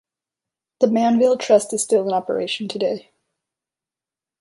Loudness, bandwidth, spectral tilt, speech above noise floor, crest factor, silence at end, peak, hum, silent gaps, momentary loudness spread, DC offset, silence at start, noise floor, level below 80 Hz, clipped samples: -19 LUFS; 11.5 kHz; -4 dB/octave; 71 dB; 18 dB; 1.4 s; -2 dBFS; none; none; 8 LU; under 0.1%; 0.8 s; -90 dBFS; -68 dBFS; under 0.1%